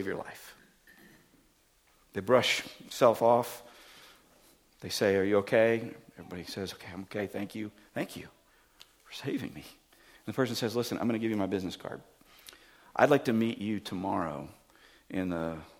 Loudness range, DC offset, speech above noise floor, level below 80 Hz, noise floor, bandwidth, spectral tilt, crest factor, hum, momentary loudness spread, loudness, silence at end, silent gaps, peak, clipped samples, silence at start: 10 LU; under 0.1%; 36 dB; -68 dBFS; -67 dBFS; 18 kHz; -5 dB/octave; 26 dB; none; 23 LU; -31 LUFS; 0.1 s; none; -6 dBFS; under 0.1%; 0 s